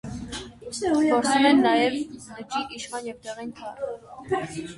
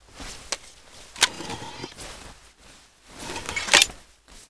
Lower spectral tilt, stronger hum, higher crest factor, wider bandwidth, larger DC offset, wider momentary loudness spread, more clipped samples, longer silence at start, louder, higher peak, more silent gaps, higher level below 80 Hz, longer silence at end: first, -4 dB/octave vs 0 dB/octave; neither; second, 18 dB vs 28 dB; about the same, 11.5 kHz vs 11 kHz; neither; second, 18 LU vs 23 LU; neither; about the same, 0.05 s vs 0.15 s; about the same, -24 LUFS vs -23 LUFS; second, -6 dBFS vs 0 dBFS; neither; about the same, -54 dBFS vs -50 dBFS; about the same, 0 s vs 0.05 s